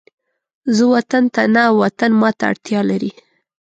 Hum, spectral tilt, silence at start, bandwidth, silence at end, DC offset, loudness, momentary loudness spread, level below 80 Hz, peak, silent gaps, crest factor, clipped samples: none; -6 dB/octave; 0.65 s; 8 kHz; 0.5 s; under 0.1%; -15 LUFS; 8 LU; -62 dBFS; -2 dBFS; none; 14 dB; under 0.1%